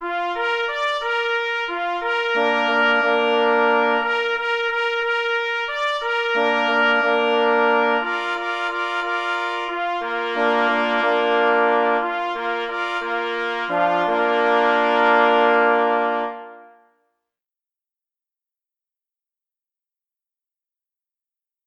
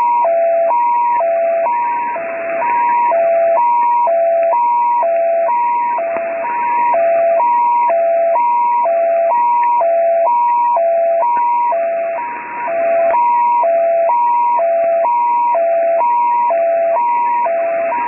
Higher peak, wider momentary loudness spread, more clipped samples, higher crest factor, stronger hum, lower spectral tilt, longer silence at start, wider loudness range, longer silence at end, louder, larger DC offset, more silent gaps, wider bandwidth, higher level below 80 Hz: about the same, -2 dBFS vs -4 dBFS; about the same, 7 LU vs 5 LU; neither; first, 20 dB vs 10 dB; neither; second, -3.5 dB/octave vs -8.5 dB/octave; about the same, 0 s vs 0 s; about the same, 3 LU vs 1 LU; first, 5 s vs 0 s; second, -19 LUFS vs -14 LUFS; neither; neither; first, 9.4 kHz vs 2.9 kHz; first, -62 dBFS vs -68 dBFS